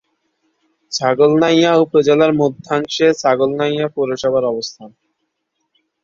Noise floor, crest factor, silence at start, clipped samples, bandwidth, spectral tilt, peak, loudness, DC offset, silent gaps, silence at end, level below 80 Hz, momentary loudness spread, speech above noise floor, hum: -72 dBFS; 16 dB; 0.9 s; under 0.1%; 7.6 kHz; -5 dB/octave; 0 dBFS; -15 LUFS; under 0.1%; none; 1.15 s; -58 dBFS; 9 LU; 57 dB; none